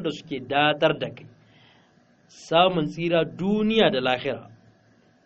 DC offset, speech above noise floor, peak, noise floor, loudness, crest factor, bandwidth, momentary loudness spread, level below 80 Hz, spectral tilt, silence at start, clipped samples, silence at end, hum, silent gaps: under 0.1%; 36 dB; -4 dBFS; -59 dBFS; -23 LUFS; 22 dB; 8 kHz; 11 LU; -58 dBFS; -3 dB/octave; 0 s; under 0.1%; 0.8 s; none; none